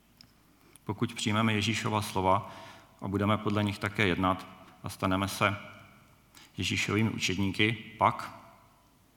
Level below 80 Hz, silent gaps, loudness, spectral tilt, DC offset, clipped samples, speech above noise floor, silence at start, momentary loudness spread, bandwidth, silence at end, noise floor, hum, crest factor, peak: -68 dBFS; none; -30 LUFS; -5 dB/octave; under 0.1%; under 0.1%; 33 dB; 0.9 s; 17 LU; 18.5 kHz; 0.7 s; -62 dBFS; none; 22 dB; -10 dBFS